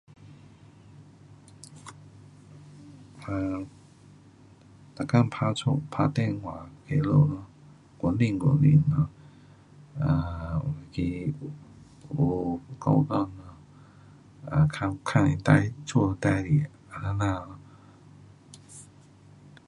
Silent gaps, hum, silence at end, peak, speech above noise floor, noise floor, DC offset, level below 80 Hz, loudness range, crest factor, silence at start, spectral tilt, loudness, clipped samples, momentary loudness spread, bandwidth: none; none; 0.85 s; -4 dBFS; 29 dB; -54 dBFS; under 0.1%; -48 dBFS; 14 LU; 26 dB; 0.25 s; -7.5 dB/octave; -27 LUFS; under 0.1%; 23 LU; 11 kHz